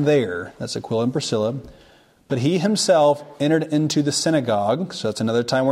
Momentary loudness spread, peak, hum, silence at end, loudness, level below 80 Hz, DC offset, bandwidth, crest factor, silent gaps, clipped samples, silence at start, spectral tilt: 10 LU; -6 dBFS; none; 0 s; -21 LUFS; -58 dBFS; under 0.1%; 15.5 kHz; 14 dB; none; under 0.1%; 0 s; -5 dB/octave